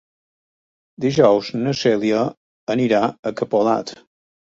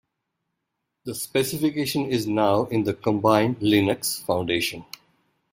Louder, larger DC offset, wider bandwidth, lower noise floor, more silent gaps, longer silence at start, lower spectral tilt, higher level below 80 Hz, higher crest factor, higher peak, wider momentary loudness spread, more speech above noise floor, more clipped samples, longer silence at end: first, -19 LUFS vs -23 LUFS; neither; second, 7.8 kHz vs 16 kHz; first, under -90 dBFS vs -80 dBFS; first, 2.37-2.67 s, 3.19-3.23 s vs none; about the same, 1 s vs 1.05 s; about the same, -6 dB/octave vs -5 dB/octave; about the same, -60 dBFS vs -58 dBFS; about the same, 18 dB vs 20 dB; about the same, -2 dBFS vs -4 dBFS; second, 10 LU vs 14 LU; first, over 72 dB vs 57 dB; neither; about the same, 0.65 s vs 0.7 s